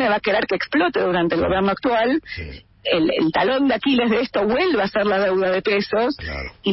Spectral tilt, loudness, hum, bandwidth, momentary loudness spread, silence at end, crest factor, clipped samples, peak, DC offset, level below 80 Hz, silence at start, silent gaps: -9 dB/octave; -20 LUFS; none; 5.8 kHz; 7 LU; 0 s; 12 dB; under 0.1%; -6 dBFS; under 0.1%; -44 dBFS; 0 s; none